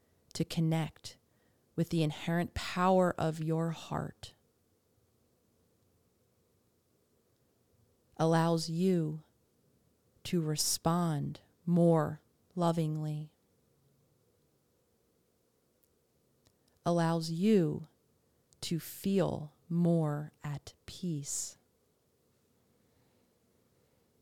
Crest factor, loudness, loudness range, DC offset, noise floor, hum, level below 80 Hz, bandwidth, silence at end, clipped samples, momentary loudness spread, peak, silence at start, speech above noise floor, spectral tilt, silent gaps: 20 dB; -33 LUFS; 10 LU; under 0.1%; -74 dBFS; none; -64 dBFS; 16 kHz; 2.7 s; under 0.1%; 16 LU; -16 dBFS; 0.35 s; 42 dB; -6 dB/octave; none